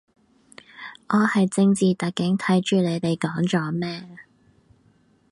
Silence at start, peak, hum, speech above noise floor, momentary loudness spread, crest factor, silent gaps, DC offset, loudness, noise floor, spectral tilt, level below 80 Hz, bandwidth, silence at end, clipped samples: 0.8 s; -6 dBFS; none; 39 dB; 15 LU; 16 dB; none; under 0.1%; -22 LUFS; -60 dBFS; -6 dB/octave; -64 dBFS; 11.5 kHz; 1.1 s; under 0.1%